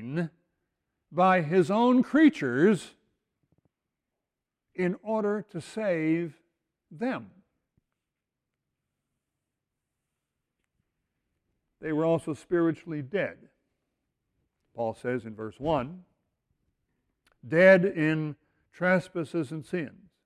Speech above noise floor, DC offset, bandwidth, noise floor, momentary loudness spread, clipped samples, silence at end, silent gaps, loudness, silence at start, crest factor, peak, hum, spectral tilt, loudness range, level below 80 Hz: 62 dB; under 0.1%; 11 kHz; -88 dBFS; 14 LU; under 0.1%; 0.35 s; none; -27 LUFS; 0 s; 22 dB; -8 dBFS; none; -7.5 dB/octave; 11 LU; -66 dBFS